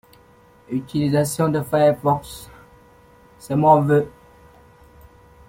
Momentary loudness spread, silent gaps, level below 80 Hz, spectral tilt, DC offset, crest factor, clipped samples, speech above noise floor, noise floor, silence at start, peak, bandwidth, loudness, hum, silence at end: 14 LU; none; -52 dBFS; -6.5 dB/octave; under 0.1%; 20 dB; under 0.1%; 33 dB; -51 dBFS; 0.7 s; -2 dBFS; 16.5 kHz; -19 LUFS; none; 1.4 s